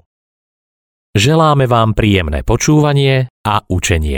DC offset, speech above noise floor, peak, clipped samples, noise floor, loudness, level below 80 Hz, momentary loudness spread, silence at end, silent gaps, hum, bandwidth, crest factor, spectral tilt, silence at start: under 0.1%; over 78 dB; 0 dBFS; under 0.1%; under -90 dBFS; -13 LUFS; -26 dBFS; 6 LU; 0 s; 3.30-3.44 s; none; 18.5 kHz; 14 dB; -5.5 dB/octave; 1.15 s